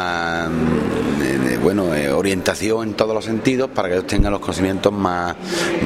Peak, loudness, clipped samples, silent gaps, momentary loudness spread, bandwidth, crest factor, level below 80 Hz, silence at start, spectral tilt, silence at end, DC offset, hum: 0 dBFS; -19 LUFS; under 0.1%; none; 3 LU; 16 kHz; 18 dB; -34 dBFS; 0 s; -5.5 dB/octave; 0 s; under 0.1%; none